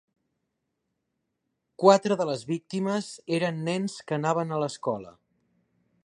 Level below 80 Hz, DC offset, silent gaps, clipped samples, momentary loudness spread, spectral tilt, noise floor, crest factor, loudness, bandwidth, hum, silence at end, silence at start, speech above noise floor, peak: -74 dBFS; under 0.1%; none; under 0.1%; 12 LU; -5.5 dB/octave; -80 dBFS; 26 dB; -27 LUFS; 11 kHz; none; 0.95 s; 1.8 s; 54 dB; -4 dBFS